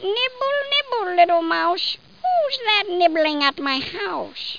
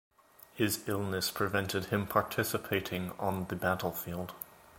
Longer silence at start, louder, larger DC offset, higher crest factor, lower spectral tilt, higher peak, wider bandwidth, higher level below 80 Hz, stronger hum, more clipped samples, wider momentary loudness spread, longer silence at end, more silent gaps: second, 0 s vs 0.55 s; first, -20 LUFS vs -33 LUFS; first, 0.3% vs under 0.1%; second, 18 dB vs 24 dB; about the same, -3.5 dB/octave vs -4.5 dB/octave; first, -2 dBFS vs -12 dBFS; second, 5.2 kHz vs 17 kHz; about the same, -64 dBFS vs -60 dBFS; neither; neither; about the same, 9 LU vs 9 LU; about the same, 0 s vs 0 s; neither